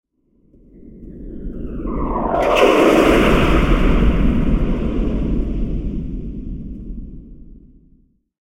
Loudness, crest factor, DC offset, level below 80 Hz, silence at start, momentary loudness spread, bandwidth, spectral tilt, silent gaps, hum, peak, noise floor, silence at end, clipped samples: -17 LUFS; 18 dB; under 0.1%; -22 dBFS; 0.75 s; 21 LU; 16 kHz; -6.5 dB/octave; none; none; 0 dBFS; -58 dBFS; 0.85 s; under 0.1%